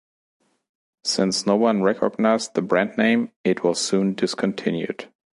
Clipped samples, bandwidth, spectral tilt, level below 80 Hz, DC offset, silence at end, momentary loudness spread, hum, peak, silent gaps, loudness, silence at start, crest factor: under 0.1%; 11.5 kHz; -4.5 dB/octave; -68 dBFS; under 0.1%; 0.3 s; 6 LU; none; -4 dBFS; 3.36-3.44 s; -22 LUFS; 1.05 s; 18 dB